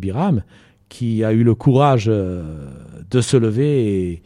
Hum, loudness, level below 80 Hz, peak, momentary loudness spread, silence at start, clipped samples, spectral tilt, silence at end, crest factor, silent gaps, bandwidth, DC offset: none; -17 LUFS; -44 dBFS; -2 dBFS; 16 LU; 0 s; under 0.1%; -7.5 dB/octave; 0.1 s; 16 dB; none; 11.5 kHz; under 0.1%